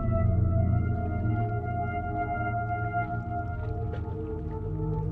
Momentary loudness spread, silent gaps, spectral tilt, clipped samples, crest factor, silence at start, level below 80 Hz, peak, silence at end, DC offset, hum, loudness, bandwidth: 8 LU; none; -11.5 dB/octave; under 0.1%; 14 dB; 0 s; -38 dBFS; -14 dBFS; 0 s; under 0.1%; none; -30 LUFS; 3.1 kHz